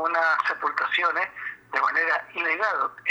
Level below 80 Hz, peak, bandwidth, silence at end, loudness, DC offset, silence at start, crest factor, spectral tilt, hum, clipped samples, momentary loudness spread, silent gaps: -74 dBFS; -8 dBFS; over 20 kHz; 0 s; -24 LUFS; under 0.1%; 0 s; 16 dB; -2 dB/octave; none; under 0.1%; 6 LU; none